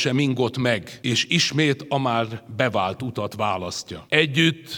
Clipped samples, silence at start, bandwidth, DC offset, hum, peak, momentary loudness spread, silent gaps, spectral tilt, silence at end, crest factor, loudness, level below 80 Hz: under 0.1%; 0 s; 18.5 kHz; under 0.1%; none; -2 dBFS; 10 LU; none; -4.5 dB/octave; 0 s; 22 dB; -22 LUFS; -60 dBFS